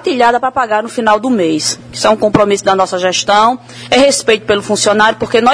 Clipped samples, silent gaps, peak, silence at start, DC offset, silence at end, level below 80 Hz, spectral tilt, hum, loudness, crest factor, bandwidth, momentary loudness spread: 0.3%; none; 0 dBFS; 0 s; under 0.1%; 0 s; -46 dBFS; -3 dB/octave; none; -11 LUFS; 12 dB; 11 kHz; 5 LU